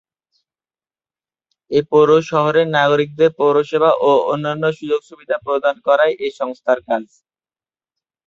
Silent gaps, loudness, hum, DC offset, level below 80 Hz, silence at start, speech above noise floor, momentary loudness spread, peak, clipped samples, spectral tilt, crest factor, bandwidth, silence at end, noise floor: none; -16 LUFS; none; under 0.1%; -62 dBFS; 1.7 s; over 74 dB; 10 LU; 0 dBFS; under 0.1%; -6 dB/octave; 16 dB; 7.4 kHz; 1.2 s; under -90 dBFS